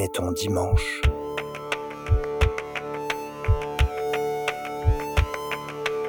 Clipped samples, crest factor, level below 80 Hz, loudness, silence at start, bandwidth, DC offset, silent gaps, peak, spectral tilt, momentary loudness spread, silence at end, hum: under 0.1%; 18 dB; -30 dBFS; -27 LUFS; 0 s; 18 kHz; under 0.1%; none; -6 dBFS; -5.5 dB/octave; 7 LU; 0 s; none